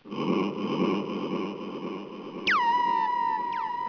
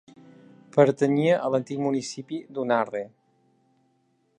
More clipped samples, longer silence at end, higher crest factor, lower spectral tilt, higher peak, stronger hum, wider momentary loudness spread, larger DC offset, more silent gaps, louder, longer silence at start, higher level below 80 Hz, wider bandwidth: neither; second, 0 s vs 1.3 s; second, 14 dB vs 22 dB; about the same, -6 dB/octave vs -6.5 dB/octave; second, -14 dBFS vs -4 dBFS; neither; about the same, 12 LU vs 14 LU; neither; neither; second, -28 LUFS vs -25 LUFS; second, 0.05 s vs 0.75 s; first, -70 dBFS vs -78 dBFS; second, 5.4 kHz vs 10.5 kHz